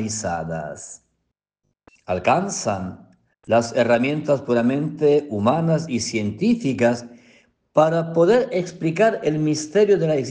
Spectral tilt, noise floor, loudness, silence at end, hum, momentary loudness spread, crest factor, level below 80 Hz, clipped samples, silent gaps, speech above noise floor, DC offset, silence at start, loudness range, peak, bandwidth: -5.5 dB/octave; -76 dBFS; -20 LUFS; 0 s; none; 10 LU; 16 dB; -58 dBFS; under 0.1%; none; 56 dB; under 0.1%; 0 s; 5 LU; -4 dBFS; 10 kHz